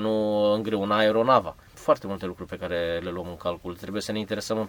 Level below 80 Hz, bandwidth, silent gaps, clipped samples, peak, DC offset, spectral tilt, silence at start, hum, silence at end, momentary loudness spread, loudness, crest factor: -54 dBFS; 19.5 kHz; none; under 0.1%; -6 dBFS; under 0.1%; -5.5 dB/octave; 0 s; none; 0 s; 13 LU; -26 LUFS; 20 dB